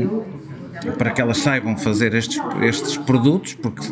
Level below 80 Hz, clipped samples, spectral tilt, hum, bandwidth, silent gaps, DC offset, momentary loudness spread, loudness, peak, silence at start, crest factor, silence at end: -52 dBFS; under 0.1%; -5.5 dB/octave; none; 10 kHz; none; under 0.1%; 12 LU; -20 LUFS; -2 dBFS; 0 s; 18 dB; 0 s